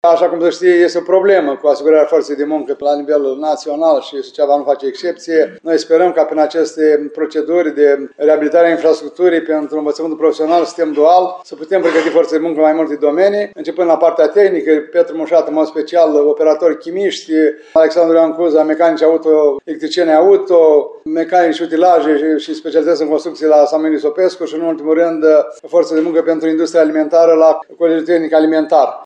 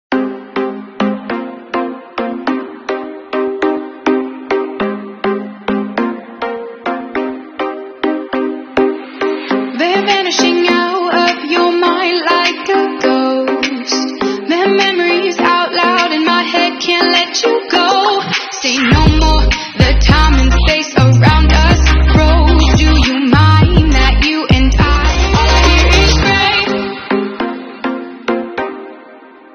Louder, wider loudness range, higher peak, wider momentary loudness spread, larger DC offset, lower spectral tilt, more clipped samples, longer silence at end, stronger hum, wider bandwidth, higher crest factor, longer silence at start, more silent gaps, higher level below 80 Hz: about the same, -13 LUFS vs -13 LUFS; second, 3 LU vs 9 LU; about the same, 0 dBFS vs 0 dBFS; second, 7 LU vs 12 LU; neither; about the same, -5 dB/octave vs -5 dB/octave; second, under 0.1% vs 0.1%; second, 0 s vs 0.35 s; neither; first, 9 kHz vs 6.8 kHz; about the same, 12 dB vs 12 dB; about the same, 0.05 s vs 0.1 s; neither; second, -72 dBFS vs -18 dBFS